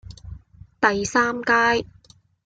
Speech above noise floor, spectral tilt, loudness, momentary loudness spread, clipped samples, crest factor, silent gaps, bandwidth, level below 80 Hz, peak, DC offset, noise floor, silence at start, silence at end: 34 dB; -3.5 dB/octave; -20 LUFS; 16 LU; under 0.1%; 18 dB; none; 9.2 kHz; -50 dBFS; -4 dBFS; under 0.1%; -54 dBFS; 0.05 s; 0.65 s